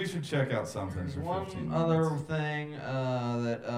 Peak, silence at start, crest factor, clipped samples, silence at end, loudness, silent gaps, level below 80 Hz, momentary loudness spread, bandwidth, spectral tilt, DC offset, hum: -16 dBFS; 0 s; 16 dB; under 0.1%; 0 s; -32 LUFS; none; -58 dBFS; 8 LU; 13.5 kHz; -7 dB/octave; under 0.1%; none